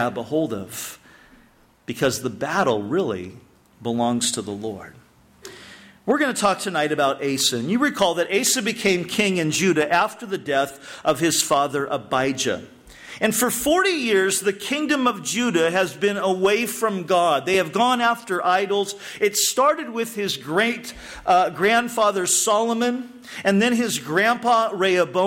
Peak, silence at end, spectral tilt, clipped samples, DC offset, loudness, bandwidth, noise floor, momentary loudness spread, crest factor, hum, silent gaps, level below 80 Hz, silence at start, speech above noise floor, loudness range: -6 dBFS; 0 s; -3 dB/octave; under 0.1%; under 0.1%; -21 LUFS; 16.5 kHz; -55 dBFS; 11 LU; 16 dB; none; none; -58 dBFS; 0 s; 34 dB; 5 LU